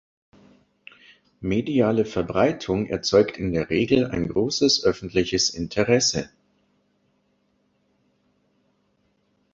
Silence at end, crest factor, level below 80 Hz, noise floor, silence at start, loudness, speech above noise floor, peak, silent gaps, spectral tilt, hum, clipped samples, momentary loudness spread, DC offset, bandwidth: 3.25 s; 20 dB; -50 dBFS; -68 dBFS; 1.4 s; -22 LUFS; 46 dB; -4 dBFS; none; -4 dB/octave; 50 Hz at -55 dBFS; under 0.1%; 7 LU; under 0.1%; 8 kHz